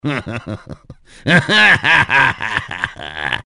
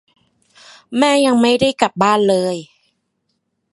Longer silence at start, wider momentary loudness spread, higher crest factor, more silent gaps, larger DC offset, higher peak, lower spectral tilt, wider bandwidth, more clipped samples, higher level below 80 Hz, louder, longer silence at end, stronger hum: second, 0.05 s vs 0.9 s; first, 17 LU vs 10 LU; about the same, 16 dB vs 18 dB; neither; neither; about the same, 0 dBFS vs 0 dBFS; about the same, -4.5 dB/octave vs -4.5 dB/octave; about the same, 11.5 kHz vs 11.5 kHz; neither; first, -44 dBFS vs -54 dBFS; about the same, -13 LUFS vs -15 LUFS; second, 0.05 s vs 1.1 s; neither